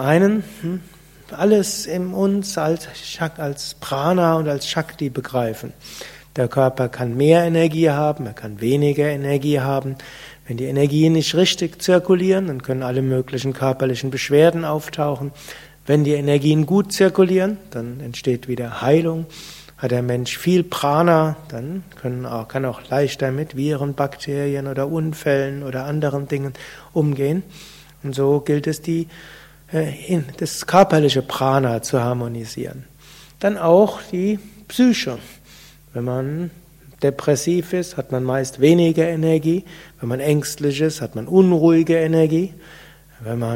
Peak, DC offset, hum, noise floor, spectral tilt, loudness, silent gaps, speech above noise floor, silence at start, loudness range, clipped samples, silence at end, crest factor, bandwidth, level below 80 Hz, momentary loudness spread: 0 dBFS; under 0.1%; none; -46 dBFS; -6 dB/octave; -19 LUFS; none; 27 dB; 0 s; 5 LU; under 0.1%; 0 s; 20 dB; 16.5 kHz; -52 dBFS; 15 LU